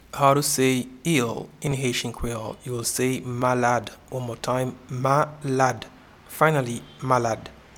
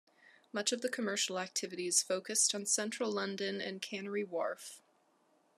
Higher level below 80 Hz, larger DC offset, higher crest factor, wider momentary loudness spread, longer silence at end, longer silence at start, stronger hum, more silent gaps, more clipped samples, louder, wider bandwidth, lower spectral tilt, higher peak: first, -48 dBFS vs under -90 dBFS; neither; about the same, 22 dB vs 22 dB; about the same, 12 LU vs 10 LU; second, 0.25 s vs 0.8 s; about the same, 0.15 s vs 0.25 s; neither; neither; neither; first, -24 LUFS vs -35 LUFS; first, 18 kHz vs 13.5 kHz; first, -4.5 dB/octave vs -1.5 dB/octave; first, -2 dBFS vs -16 dBFS